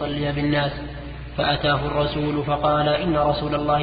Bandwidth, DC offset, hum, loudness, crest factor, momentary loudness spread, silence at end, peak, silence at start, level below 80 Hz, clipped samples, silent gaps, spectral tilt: 5 kHz; under 0.1%; none; -22 LUFS; 14 dB; 10 LU; 0 s; -8 dBFS; 0 s; -38 dBFS; under 0.1%; none; -11 dB/octave